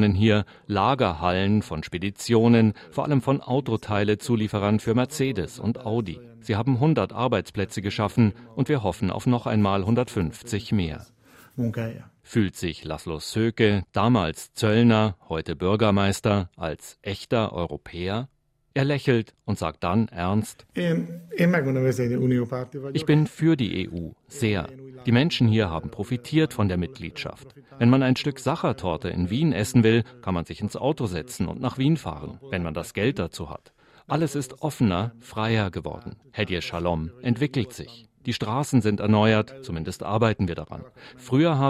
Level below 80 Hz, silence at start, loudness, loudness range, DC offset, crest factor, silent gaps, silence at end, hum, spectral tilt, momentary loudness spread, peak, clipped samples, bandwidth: -52 dBFS; 0 s; -25 LUFS; 5 LU; under 0.1%; 18 dB; none; 0 s; none; -6.5 dB/octave; 12 LU; -6 dBFS; under 0.1%; 14.5 kHz